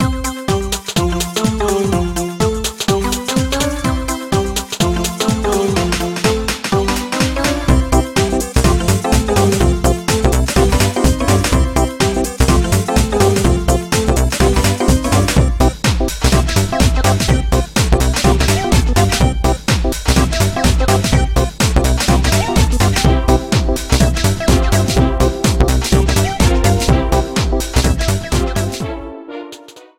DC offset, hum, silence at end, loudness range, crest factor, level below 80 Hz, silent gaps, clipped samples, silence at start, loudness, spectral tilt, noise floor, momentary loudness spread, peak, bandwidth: 0.2%; none; 0.2 s; 3 LU; 14 dB; -18 dBFS; none; under 0.1%; 0 s; -15 LUFS; -5 dB/octave; -37 dBFS; 5 LU; 0 dBFS; 16.5 kHz